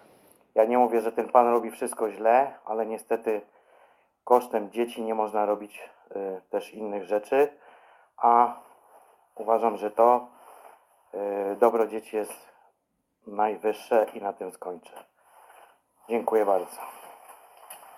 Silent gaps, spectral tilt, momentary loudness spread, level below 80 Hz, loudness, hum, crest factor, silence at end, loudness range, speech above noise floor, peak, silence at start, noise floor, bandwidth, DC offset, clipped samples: none; -5 dB/octave; 18 LU; -78 dBFS; -26 LUFS; none; 22 dB; 0.2 s; 6 LU; 51 dB; -4 dBFS; 0.55 s; -76 dBFS; 16.5 kHz; under 0.1%; under 0.1%